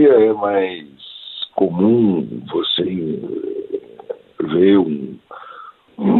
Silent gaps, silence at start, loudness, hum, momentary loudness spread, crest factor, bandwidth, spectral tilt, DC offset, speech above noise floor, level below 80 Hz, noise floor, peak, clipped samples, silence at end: none; 0 s; -18 LUFS; none; 22 LU; 16 dB; 4.3 kHz; -10 dB/octave; under 0.1%; 23 dB; -60 dBFS; -39 dBFS; -2 dBFS; under 0.1%; 0 s